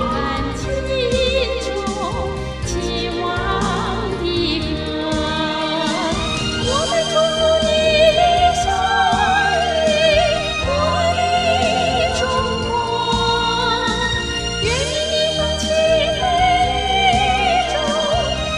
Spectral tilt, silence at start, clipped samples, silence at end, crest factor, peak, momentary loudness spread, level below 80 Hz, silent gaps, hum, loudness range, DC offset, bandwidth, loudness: -4 dB/octave; 0 s; under 0.1%; 0 s; 14 dB; -2 dBFS; 7 LU; -30 dBFS; none; none; 6 LU; 0.2%; 12 kHz; -17 LUFS